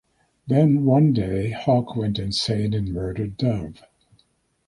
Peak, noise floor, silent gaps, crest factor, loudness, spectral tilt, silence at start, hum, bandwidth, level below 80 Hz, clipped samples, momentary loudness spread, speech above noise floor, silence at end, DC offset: -6 dBFS; -65 dBFS; none; 18 dB; -22 LUFS; -7.5 dB/octave; 0.45 s; none; 11.5 kHz; -44 dBFS; under 0.1%; 10 LU; 44 dB; 0.95 s; under 0.1%